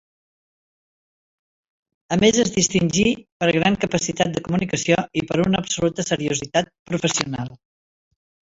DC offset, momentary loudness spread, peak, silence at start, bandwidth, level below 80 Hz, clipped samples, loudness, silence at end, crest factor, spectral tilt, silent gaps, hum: under 0.1%; 6 LU; -2 dBFS; 2.1 s; 8 kHz; -50 dBFS; under 0.1%; -21 LUFS; 1 s; 20 dB; -4 dB/octave; 3.32-3.40 s, 6.79-6.86 s; none